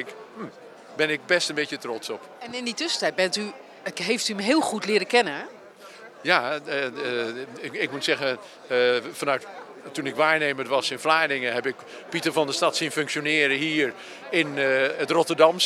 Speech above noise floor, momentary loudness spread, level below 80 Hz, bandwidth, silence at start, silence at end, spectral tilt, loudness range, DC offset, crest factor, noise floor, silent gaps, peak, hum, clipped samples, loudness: 20 dB; 15 LU; -84 dBFS; 15.5 kHz; 0 s; 0 s; -3 dB/octave; 3 LU; under 0.1%; 22 dB; -45 dBFS; none; -2 dBFS; none; under 0.1%; -24 LUFS